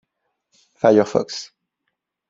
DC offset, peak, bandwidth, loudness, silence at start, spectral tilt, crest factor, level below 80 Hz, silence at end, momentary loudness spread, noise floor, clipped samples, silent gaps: under 0.1%; -2 dBFS; 7.8 kHz; -18 LUFS; 0.85 s; -5.5 dB/octave; 20 dB; -64 dBFS; 0.85 s; 17 LU; -78 dBFS; under 0.1%; none